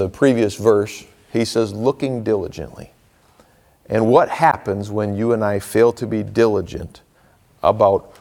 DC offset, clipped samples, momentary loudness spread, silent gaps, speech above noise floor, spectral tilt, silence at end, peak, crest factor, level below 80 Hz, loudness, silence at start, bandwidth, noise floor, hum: under 0.1%; under 0.1%; 14 LU; none; 37 dB; -6.5 dB/octave; 0.2 s; -2 dBFS; 18 dB; -48 dBFS; -18 LUFS; 0 s; 17.5 kHz; -54 dBFS; none